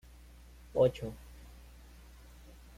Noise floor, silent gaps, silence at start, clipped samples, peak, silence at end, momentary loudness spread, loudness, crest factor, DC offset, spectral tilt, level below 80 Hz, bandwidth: -55 dBFS; none; 0.75 s; under 0.1%; -16 dBFS; 1.65 s; 27 LU; -32 LUFS; 22 dB; under 0.1%; -7 dB/octave; -54 dBFS; 15.5 kHz